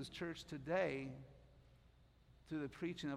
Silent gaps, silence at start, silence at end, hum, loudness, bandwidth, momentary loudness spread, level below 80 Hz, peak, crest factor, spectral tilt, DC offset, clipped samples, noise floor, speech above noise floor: none; 0 s; 0 s; none; -45 LUFS; 14 kHz; 14 LU; -70 dBFS; -26 dBFS; 20 dB; -6 dB/octave; under 0.1%; under 0.1%; -69 dBFS; 25 dB